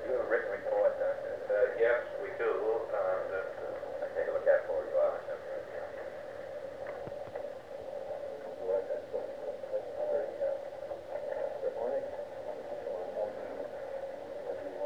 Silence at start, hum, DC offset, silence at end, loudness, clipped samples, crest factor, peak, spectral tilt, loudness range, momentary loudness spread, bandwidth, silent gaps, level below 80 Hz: 0 s; none; 0.1%; 0 s; -35 LUFS; under 0.1%; 20 dB; -16 dBFS; -5.5 dB/octave; 7 LU; 12 LU; 9.2 kHz; none; -70 dBFS